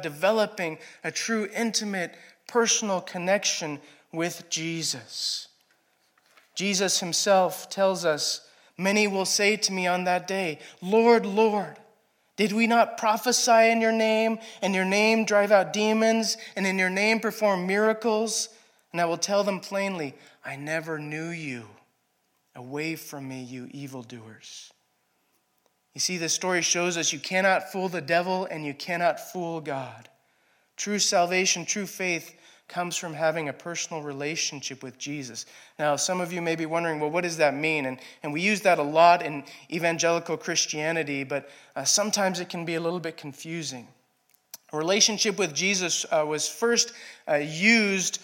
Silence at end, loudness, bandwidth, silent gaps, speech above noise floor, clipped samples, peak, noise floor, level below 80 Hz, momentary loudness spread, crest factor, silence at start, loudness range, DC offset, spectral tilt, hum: 0 s; -25 LUFS; 17.5 kHz; none; 46 dB; under 0.1%; -4 dBFS; -72 dBFS; -84 dBFS; 15 LU; 22 dB; 0 s; 9 LU; under 0.1%; -2.5 dB/octave; none